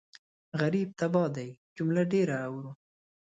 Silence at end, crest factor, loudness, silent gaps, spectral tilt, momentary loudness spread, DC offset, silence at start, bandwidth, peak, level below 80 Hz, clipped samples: 0.5 s; 16 dB; -30 LUFS; 1.57-1.76 s; -7.5 dB/octave; 14 LU; under 0.1%; 0.55 s; 7.8 kHz; -14 dBFS; -74 dBFS; under 0.1%